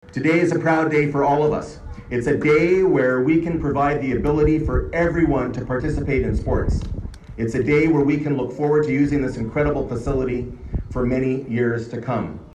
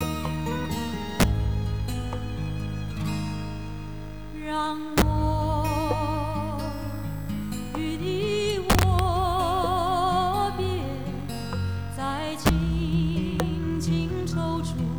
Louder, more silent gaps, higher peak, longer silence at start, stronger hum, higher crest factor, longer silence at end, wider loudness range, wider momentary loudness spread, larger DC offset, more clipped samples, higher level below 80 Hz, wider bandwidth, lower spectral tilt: first, -20 LUFS vs -27 LUFS; neither; first, -6 dBFS vs -10 dBFS; about the same, 0.1 s vs 0 s; neither; about the same, 14 dB vs 16 dB; about the same, 0.1 s vs 0 s; about the same, 4 LU vs 5 LU; about the same, 10 LU vs 9 LU; second, under 0.1% vs 0.9%; neither; about the same, -32 dBFS vs -34 dBFS; second, 10 kHz vs over 20 kHz; first, -8 dB/octave vs -6 dB/octave